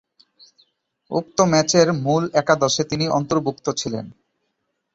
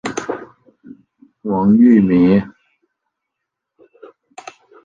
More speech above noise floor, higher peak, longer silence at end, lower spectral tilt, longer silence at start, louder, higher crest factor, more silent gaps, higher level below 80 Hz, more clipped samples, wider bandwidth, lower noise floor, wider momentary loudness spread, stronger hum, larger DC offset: second, 55 dB vs 68 dB; about the same, -2 dBFS vs -2 dBFS; second, 0.85 s vs 2.35 s; second, -4.5 dB/octave vs -7.5 dB/octave; first, 1.1 s vs 0.05 s; second, -20 LUFS vs -13 LUFS; about the same, 20 dB vs 16 dB; neither; second, -56 dBFS vs -50 dBFS; neither; about the same, 8 kHz vs 7.8 kHz; second, -74 dBFS vs -79 dBFS; second, 11 LU vs 27 LU; neither; neither